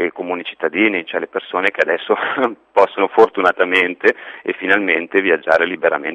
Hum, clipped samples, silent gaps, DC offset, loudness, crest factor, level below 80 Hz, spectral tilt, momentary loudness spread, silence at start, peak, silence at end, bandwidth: none; under 0.1%; none; under 0.1%; -16 LUFS; 16 dB; -62 dBFS; -5 dB/octave; 9 LU; 0 s; 0 dBFS; 0 s; 9.2 kHz